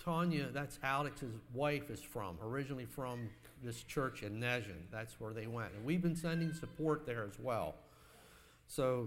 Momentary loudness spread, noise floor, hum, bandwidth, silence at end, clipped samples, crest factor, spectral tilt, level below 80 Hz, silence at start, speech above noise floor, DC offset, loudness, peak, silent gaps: 10 LU; -63 dBFS; none; 16 kHz; 0 s; under 0.1%; 20 dB; -6 dB/octave; -62 dBFS; 0 s; 23 dB; under 0.1%; -41 LUFS; -22 dBFS; none